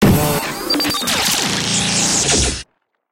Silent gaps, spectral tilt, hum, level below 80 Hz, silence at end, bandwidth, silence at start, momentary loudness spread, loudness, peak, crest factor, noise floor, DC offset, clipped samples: none; -3 dB/octave; none; -34 dBFS; 0.5 s; 17 kHz; 0 s; 6 LU; -15 LUFS; -2 dBFS; 16 dB; -46 dBFS; under 0.1%; under 0.1%